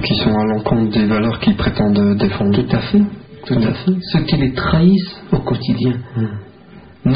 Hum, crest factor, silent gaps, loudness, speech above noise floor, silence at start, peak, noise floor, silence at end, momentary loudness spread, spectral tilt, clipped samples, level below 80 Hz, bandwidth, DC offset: none; 14 dB; none; -16 LUFS; 25 dB; 0 s; -2 dBFS; -40 dBFS; 0 s; 7 LU; -6 dB/octave; under 0.1%; -34 dBFS; 5.2 kHz; 0.2%